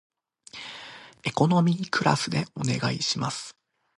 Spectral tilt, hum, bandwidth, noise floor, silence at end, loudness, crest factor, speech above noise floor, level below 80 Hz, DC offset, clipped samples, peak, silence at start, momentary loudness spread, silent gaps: -5 dB/octave; none; 11.5 kHz; -48 dBFS; 0.5 s; -26 LUFS; 22 dB; 23 dB; -62 dBFS; under 0.1%; under 0.1%; -4 dBFS; 0.55 s; 19 LU; none